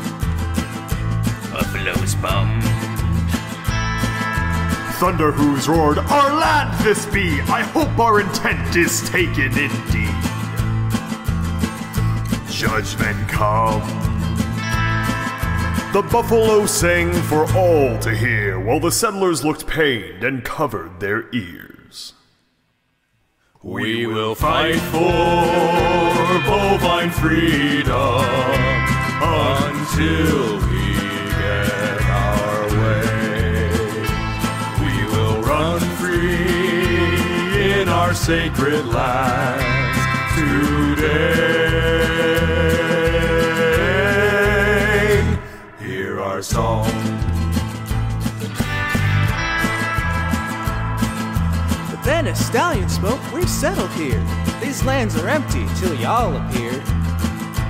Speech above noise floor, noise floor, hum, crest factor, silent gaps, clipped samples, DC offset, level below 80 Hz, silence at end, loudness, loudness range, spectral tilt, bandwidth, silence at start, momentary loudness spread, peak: 48 dB; -66 dBFS; none; 14 dB; none; under 0.1%; under 0.1%; -30 dBFS; 0 s; -18 LUFS; 5 LU; -5 dB/octave; 16 kHz; 0 s; 7 LU; -4 dBFS